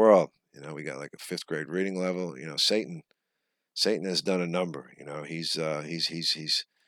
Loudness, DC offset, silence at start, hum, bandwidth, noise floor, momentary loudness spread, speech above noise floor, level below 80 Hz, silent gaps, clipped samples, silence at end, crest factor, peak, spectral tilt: -29 LUFS; under 0.1%; 0 s; none; 17.5 kHz; -82 dBFS; 15 LU; 52 dB; -84 dBFS; none; under 0.1%; 0.25 s; 22 dB; -6 dBFS; -4 dB/octave